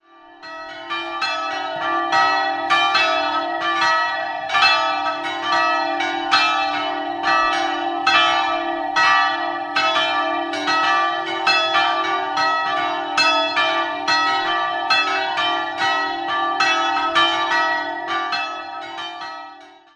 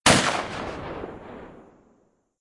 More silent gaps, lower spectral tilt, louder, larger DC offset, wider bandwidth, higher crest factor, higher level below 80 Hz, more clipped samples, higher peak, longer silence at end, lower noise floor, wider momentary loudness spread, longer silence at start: neither; about the same, -1.5 dB/octave vs -2.5 dB/octave; first, -18 LUFS vs -25 LUFS; neither; about the same, 11 kHz vs 11.5 kHz; about the same, 18 dB vs 22 dB; second, -60 dBFS vs -48 dBFS; neither; first, -2 dBFS vs -6 dBFS; second, 0.25 s vs 0.8 s; second, -42 dBFS vs -64 dBFS; second, 9 LU vs 23 LU; first, 0.3 s vs 0.05 s